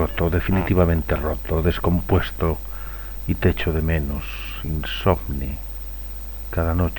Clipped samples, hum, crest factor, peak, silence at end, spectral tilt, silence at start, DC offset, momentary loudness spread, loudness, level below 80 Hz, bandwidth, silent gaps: under 0.1%; 50 Hz at -35 dBFS; 18 dB; -2 dBFS; 0 s; -7.5 dB/octave; 0 s; under 0.1%; 12 LU; -23 LUFS; -28 dBFS; 19 kHz; none